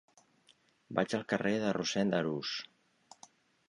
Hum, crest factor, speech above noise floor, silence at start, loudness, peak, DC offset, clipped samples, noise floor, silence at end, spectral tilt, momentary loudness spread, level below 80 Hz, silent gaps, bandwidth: none; 20 dB; 36 dB; 0.9 s; -34 LUFS; -16 dBFS; under 0.1%; under 0.1%; -69 dBFS; 1.05 s; -5 dB/octave; 7 LU; -74 dBFS; none; 11 kHz